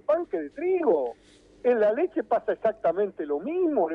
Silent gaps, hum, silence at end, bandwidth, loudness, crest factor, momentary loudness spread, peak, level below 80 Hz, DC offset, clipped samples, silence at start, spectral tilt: none; 50 Hz at -65 dBFS; 0 s; 5.8 kHz; -26 LUFS; 14 dB; 7 LU; -12 dBFS; -66 dBFS; under 0.1%; under 0.1%; 0.1 s; -8 dB/octave